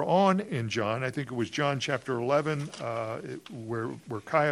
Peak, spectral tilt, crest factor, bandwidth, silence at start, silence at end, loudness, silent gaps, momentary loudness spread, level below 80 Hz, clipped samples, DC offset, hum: -10 dBFS; -6 dB/octave; 20 dB; 12 kHz; 0 s; 0 s; -30 LUFS; none; 11 LU; -70 dBFS; under 0.1%; under 0.1%; none